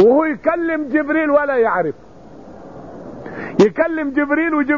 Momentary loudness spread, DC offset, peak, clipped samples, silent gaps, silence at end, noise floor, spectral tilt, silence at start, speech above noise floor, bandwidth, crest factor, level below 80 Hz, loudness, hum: 21 LU; 0.5%; -2 dBFS; under 0.1%; none; 0 s; -39 dBFS; -5 dB/octave; 0 s; 23 dB; 7.2 kHz; 14 dB; -52 dBFS; -17 LUFS; none